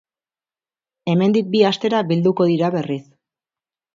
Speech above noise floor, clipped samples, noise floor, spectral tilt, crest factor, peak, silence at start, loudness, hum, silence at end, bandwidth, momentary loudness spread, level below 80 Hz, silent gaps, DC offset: over 73 dB; under 0.1%; under -90 dBFS; -7.5 dB/octave; 18 dB; -2 dBFS; 1.05 s; -18 LUFS; none; 0.95 s; 7.4 kHz; 10 LU; -66 dBFS; none; under 0.1%